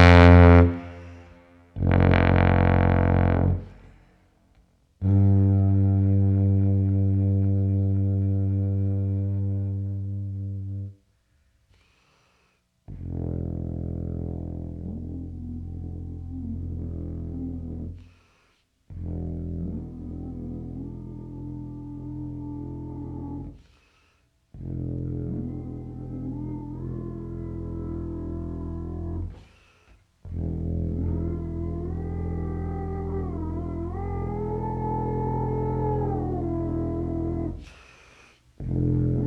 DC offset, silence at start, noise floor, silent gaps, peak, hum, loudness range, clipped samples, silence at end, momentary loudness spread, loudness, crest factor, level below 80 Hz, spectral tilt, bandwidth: under 0.1%; 0 s; -67 dBFS; none; 0 dBFS; none; 14 LU; under 0.1%; 0 s; 17 LU; -25 LUFS; 24 dB; -36 dBFS; -9 dB/octave; 6 kHz